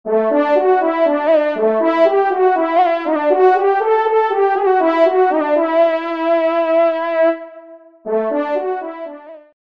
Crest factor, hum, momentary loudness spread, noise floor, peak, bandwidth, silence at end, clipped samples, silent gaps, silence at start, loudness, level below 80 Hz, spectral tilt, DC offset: 14 dB; none; 8 LU; -40 dBFS; -2 dBFS; 6 kHz; 0.3 s; under 0.1%; none; 0.05 s; -15 LUFS; -70 dBFS; -6.5 dB/octave; 0.2%